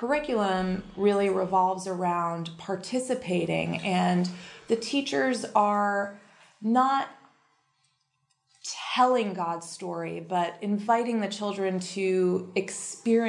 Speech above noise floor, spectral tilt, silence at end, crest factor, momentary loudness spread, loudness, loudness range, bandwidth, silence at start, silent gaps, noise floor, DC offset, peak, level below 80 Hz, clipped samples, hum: 48 dB; -5 dB/octave; 0 s; 20 dB; 11 LU; -27 LUFS; 3 LU; 11.5 kHz; 0 s; none; -74 dBFS; under 0.1%; -8 dBFS; -64 dBFS; under 0.1%; none